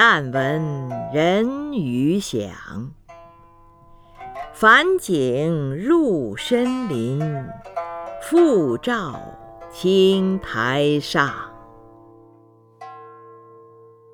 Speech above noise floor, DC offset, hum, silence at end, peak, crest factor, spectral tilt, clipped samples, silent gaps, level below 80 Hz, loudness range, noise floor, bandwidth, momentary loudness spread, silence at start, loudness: 32 dB; under 0.1%; none; 0.75 s; 0 dBFS; 22 dB; -5.5 dB/octave; under 0.1%; none; -52 dBFS; 6 LU; -52 dBFS; 17.5 kHz; 21 LU; 0 s; -20 LUFS